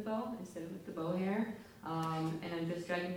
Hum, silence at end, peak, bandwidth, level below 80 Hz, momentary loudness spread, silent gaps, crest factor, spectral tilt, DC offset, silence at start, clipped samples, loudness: none; 0 s; -24 dBFS; over 20 kHz; -72 dBFS; 9 LU; none; 16 dB; -6.5 dB/octave; under 0.1%; 0 s; under 0.1%; -40 LUFS